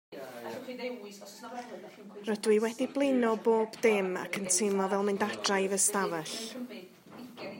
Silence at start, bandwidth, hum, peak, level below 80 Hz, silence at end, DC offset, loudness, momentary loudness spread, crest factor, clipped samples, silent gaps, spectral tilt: 0.1 s; 16.5 kHz; none; -12 dBFS; -84 dBFS; 0 s; under 0.1%; -30 LUFS; 19 LU; 20 dB; under 0.1%; none; -3 dB/octave